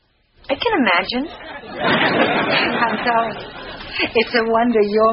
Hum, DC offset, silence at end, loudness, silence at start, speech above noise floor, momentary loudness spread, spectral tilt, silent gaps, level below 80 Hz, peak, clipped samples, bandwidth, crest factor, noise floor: none; under 0.1%; 0 s; -17 LUFS; 0.5 s; 25 dB; 15 LU; -2 dB/octave; none; -48 dBFS; 0 dBFS; under 0.1%; 5.8 kHz; 18 dB; -43 dBFS